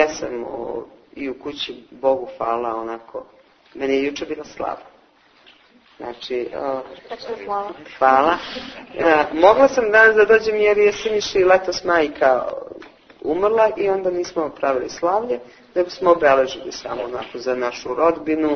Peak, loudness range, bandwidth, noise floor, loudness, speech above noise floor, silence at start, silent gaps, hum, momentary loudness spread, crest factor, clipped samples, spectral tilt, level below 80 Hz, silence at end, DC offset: 0 dBFS; 13 LU; 6.6 kHz; -54 dBFS; -19 LUFS; 35 dB; 0 s; none; none; 17 LU; 20 dB; under 0.1%; -4 dB/octave; -54 dBFS; 0 s; under 0.1%